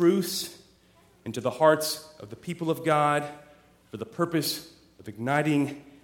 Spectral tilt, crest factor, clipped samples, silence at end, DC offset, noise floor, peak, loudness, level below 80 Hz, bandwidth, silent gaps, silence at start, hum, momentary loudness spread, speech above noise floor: -5 dB/octave; 22 dB; under 0.1%; 0.2 s; under 0.1%; -60 dBFS; -6 dBFS; -27 LUFS; -68 dBFS; 17.5 kHz; none; 0 s; none; 19 LU; 33 dB